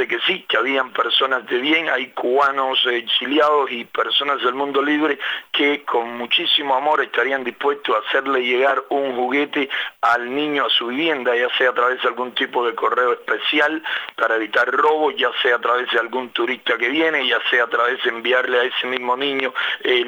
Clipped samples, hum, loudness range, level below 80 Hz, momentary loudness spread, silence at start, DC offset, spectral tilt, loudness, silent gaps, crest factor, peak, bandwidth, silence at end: under 0.1%; none; 1 LU; -78 dBFS; 5 LU; 0 s; under 0.1%; -3.5 dB/octave; -19 LUFS; none; 18 dB; -2 dBFS; over 20 kHz; 0 s